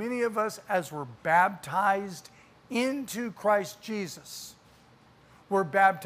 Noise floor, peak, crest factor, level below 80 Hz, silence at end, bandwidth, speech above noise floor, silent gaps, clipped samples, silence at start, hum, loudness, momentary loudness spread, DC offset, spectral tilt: -58 dBFS; -10 dBFS; 20 dB; -72 dBFS; 0 s; 15.5 kHz; 30 dB; none; under 0.1%; 0 s; none; -28 LUFS; 17 LU; under 0.1%; -4.5 dB/octave